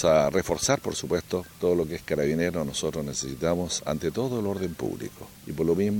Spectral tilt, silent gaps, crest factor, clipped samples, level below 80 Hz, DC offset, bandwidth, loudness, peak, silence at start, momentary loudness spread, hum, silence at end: -4.5 dB/octave; none; 20 dB; under 0.1%; -50 dBFS; under 0.1%; 17.5 kHz; -27 LUFS; -6 dBFS; 0 s; 8 LU; none; 0 s